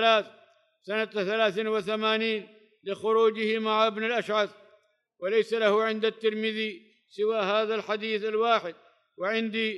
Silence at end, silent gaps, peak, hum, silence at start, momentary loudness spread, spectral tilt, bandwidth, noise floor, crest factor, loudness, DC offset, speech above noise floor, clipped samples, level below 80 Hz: 0 s; none; -10 dBFS; none; 0 s; 10 LU; -4.5 dB/octave; 11 kHz; -65 dBFS; 18 dB; -27 LUFS; under 0.1%; 38 dB; under 0.1%; -84 dBFS